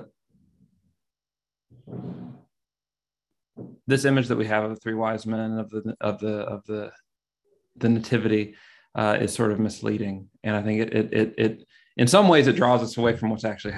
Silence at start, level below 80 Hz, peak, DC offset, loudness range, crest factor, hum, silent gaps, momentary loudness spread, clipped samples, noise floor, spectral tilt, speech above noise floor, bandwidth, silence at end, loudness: 0 s; -58 dBFS; -2 dBFS; under 0.1%; 11 LU; 22 dB; none; none; 19 LU; under 0.1%; under -90 dBFS; -6 dB/octave; over 67 dB; 12.5 kHz; 0 s; -24 LUFS